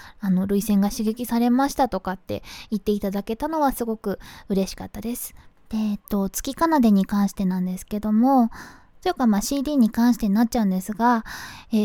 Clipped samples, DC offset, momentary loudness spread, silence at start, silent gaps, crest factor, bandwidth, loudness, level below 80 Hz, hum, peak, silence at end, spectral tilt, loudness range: under 0.1%; under 0.1%; 12 LU; 0 s; none; 14 dB; 18 kHz; -23 LUFS; -44 dBFS; none; -8 dBFS; 0 s; -6 dB/octave; 5 LU